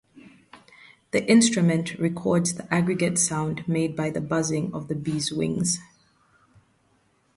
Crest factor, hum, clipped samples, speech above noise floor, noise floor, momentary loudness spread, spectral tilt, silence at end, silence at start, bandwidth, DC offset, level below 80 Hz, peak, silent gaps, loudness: 20 dB; none; under 0.1%; 42 dB; -65 dBFS; 10 LU; -4.5 dB/octave; 1.5 s; 0.15 s; 11.5 kHz; under 0.1%; -60 dBFS; -6 dBFS; none; -24 LUFS